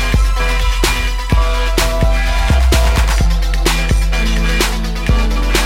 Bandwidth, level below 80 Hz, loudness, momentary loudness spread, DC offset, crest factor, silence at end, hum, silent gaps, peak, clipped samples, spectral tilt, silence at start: 16.5 kHz; -14 dBFS; -15 LUFS; 3 LU; under 0.1%; 10 dB; 0 s; none; none; -2 dBFS; under 0.1%; -4.5 dB/octave; 0 s